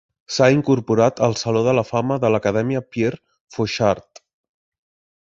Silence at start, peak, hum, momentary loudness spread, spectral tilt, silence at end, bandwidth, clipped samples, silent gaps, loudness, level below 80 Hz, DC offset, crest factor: 0.3 s; -2 dBFS; none; 9 LU; -6 dB/octave; 1.25 s; 8 kHz; under 0.1%; 3.40-3.48 s; -19 LUFS; -52 dBFS; under 0.1%; 18 dB